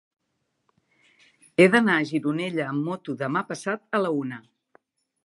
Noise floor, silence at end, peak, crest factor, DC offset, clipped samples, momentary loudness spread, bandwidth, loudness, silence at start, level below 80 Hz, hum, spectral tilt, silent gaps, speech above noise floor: -76 dBFS; 0.85 s; -4 dBFS; 22 dB; under 0.1%; under 0.1%; 13 LU; 11.5 kHz; -24 LUFS; 1.6 s; -74 dBFS; none; -6 dB/octave; none; 53 dB